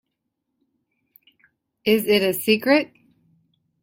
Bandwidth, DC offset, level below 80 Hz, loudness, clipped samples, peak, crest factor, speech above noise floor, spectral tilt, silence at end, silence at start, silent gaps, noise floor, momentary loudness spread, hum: 16.5 kHz; under 0.1%; -66 dBFS; -20 LUFS; under 0.1%; -4 dBFS; 20 dB; 60 dB; -4 dB/octave; 0.95 s; 1.85 s; none; -79 dBFS; 8 LU; none